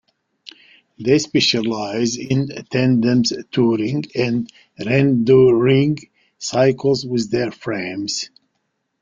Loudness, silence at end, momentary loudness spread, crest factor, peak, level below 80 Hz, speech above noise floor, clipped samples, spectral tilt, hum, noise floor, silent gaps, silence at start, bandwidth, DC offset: -18 LUFS; 0.75 s; 11 LU; 16 dB; -2 dBFS; -56 dBFS; 55 dB; under 0.1%; -5.5 dB/octave; none; -72 dBFS; none; 1 s; 7.6 kHz; under 0.1%